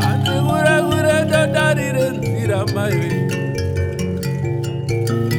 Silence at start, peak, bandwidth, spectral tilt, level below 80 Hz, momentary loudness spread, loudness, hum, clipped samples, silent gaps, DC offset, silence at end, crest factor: 0 s; -2 dBFS; 18 kHz; -6 dB/octave; -42 dBFS; 7 LU; -18 LUFS; none; under 0.1%; none; under 0.1%; 0 s; 16 dB